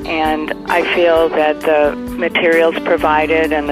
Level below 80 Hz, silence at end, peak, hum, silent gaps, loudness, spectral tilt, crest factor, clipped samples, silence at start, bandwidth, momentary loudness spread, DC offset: -38 dBFS; 0 s; 0 dBFS; none; none; -14 LUFS; -5 dB/octave; 14 dB; under 0.1%; 0 s; 15.5 kHz; 5 LU; under 0.1%